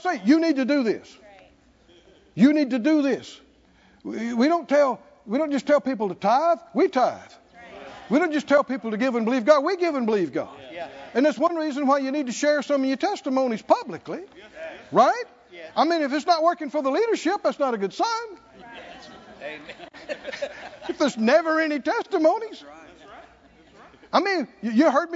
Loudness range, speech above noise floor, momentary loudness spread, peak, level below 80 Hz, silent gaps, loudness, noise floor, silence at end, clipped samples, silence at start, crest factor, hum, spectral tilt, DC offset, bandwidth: 4 LU; 34 dB; 19 LU; -4 dBFS; -68 dBFS; none; -23 LUFS; -57 dBFS; 0 s; under 0.1%; 0 s; 20 dB; none; -5 dB/octave; under 0.1%; 7.8 kHz